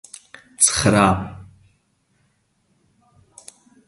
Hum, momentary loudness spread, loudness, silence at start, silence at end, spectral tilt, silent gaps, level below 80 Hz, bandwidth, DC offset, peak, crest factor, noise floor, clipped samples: none; 25 LU; -16 LUFS; 0.6 s; 2.45 s; -3.5 dB/octave; none; -44 dBFS; 11.5 kHz; under 0.1%; 0 dBFS; 24 dB; -65 dBFS; under 0.1%